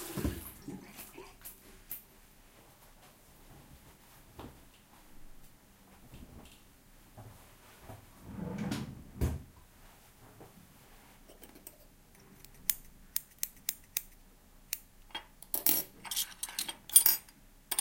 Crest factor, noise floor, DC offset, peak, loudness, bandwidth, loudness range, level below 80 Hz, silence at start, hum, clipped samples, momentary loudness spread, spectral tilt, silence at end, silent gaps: 34 dB; -59 dBFS; under 0.1%; -6 dBFS; -33 LUFS; 17 kHz; 26 LU; -54 dBFS; 0 s; none; under 0.1%; 27 LU; -2 dB/octave; 0 s; none